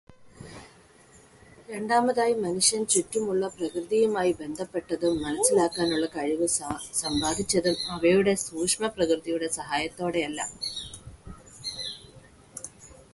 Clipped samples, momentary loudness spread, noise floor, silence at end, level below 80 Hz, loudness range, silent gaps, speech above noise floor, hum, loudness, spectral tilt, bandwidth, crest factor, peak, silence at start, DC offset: under 0.1%; 18 LU; -55 dBFS; 0.2 s; -56 dBFS; 6 LU; none; 29 dB; none; -26 LUFS; -3 dB/octave; 12 kHz; 20 dB; -8 dBFS; 0.1 s; under 0.1%